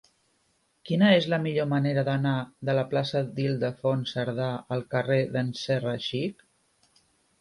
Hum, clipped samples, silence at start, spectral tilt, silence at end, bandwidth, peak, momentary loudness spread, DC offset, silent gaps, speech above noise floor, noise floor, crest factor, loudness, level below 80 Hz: none; under 0.1%; 0.85 s; -7 dB/octave; 1.1 s; 11.5 kHz; -10 dBFS; 8 LU; under 0.1%; none; 44 dB; -70 dBFS; 18 dB; -27 LUFS; -68 dBFS